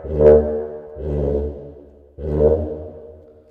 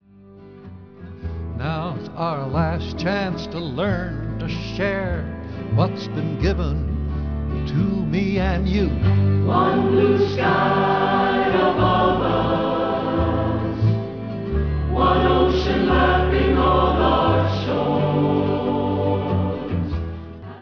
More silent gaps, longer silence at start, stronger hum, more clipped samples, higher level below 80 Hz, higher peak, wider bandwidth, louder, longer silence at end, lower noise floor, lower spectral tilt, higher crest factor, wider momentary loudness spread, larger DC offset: neither; second, 0 s vs 0.25 s; neither; neither; about the same, -30 dBFS vs -30 dBFS; first, 0 dBFS vs -4 dBFS; second, 3.4 kHz vs 5.4 kHz; first, -18 LUFS vs -21 LUFS; first, 0.35 s vs 0 s; about the same, -43 dBFS vs -45 dBFS; first, -11 dB/octave vs -8 dB/octave; about the same, 20 dB vs 16 dB; first, 22 LU vs 10 LU; second, under 0.1% vs 0.3%